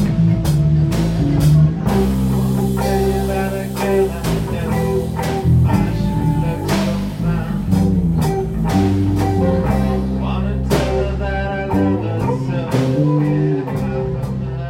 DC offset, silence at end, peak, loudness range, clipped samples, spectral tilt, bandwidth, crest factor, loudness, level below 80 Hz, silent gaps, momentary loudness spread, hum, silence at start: under 0.1%; 0 s; -2 dBFS; 2 LU; under 0.1%; -7.5 dB/octave; 16.5 kHz; 14 dB; -17 LUFS; -26 dBFS; none; 5 LU; none; 0 s